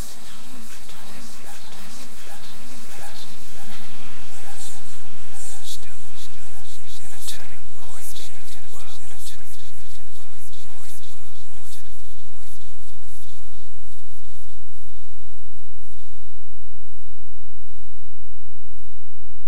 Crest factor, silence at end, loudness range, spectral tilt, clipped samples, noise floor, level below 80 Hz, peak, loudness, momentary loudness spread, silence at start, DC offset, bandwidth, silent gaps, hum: 10 dB; 0 s; 12 LU; -4 dB/octave; under 0.1%; -48 dBFS; -50 dBFS; -4 dBFS; -42 LUFS; 14 LU; 0 s; 50%; 16 kHz; none; none